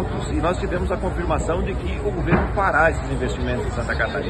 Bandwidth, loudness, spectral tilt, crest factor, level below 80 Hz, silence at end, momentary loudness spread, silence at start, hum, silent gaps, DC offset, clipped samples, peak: 9.6 kHz; -22 LUFS; -6.5 dB/octave; 18 dB; -28 dBFS; 0 s; 6 LU; 0 s; none; none; under 0.1%; under 0.1%; -4 dBFS